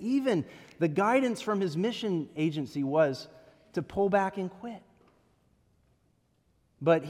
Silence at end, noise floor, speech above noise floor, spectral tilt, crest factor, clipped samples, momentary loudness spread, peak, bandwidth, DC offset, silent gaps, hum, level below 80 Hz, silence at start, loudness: 0 s; -70 dBFS; 42 dB; -6.5 dB/octave; 20 dB; under 0.1%; 15 LU; -12 dBFS; 14 kHz; under 0.1%; none; none; -68 dBFS; 0 s; -29 LUFS